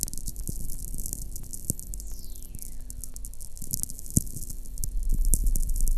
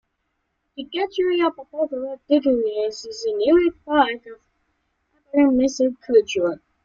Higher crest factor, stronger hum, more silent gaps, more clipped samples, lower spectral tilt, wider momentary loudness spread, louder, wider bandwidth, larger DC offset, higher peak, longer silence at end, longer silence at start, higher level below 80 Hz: first, 26 dB vs 18 dB; neither; neither; neither; about the same, -4.5 dB/octave vs -4 dB/octave; first, 13 LU vs 10 LU; second, -33 LUFS vs -21 LUFS; first, 15 kHz vs 7.6 kHz; neither; about the same, -2 dBFS vs -4 dBFS; second, 0 s vs 0.3 s; second, 0 s vs 0.75 s; first, -30 dBFS vs -56 dBFS